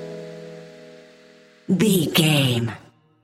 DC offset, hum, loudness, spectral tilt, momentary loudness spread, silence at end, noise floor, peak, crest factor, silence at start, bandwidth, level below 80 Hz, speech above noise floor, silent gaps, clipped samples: under 0.1%; none; -19 LUFS; -5 dB/octave; 23 LU; 0.45 s; -51 dBFS; -4 dBFS; 20 dB; 0 s; 16 kHz; -62 dBFS; 32 dB; none; under 0.1%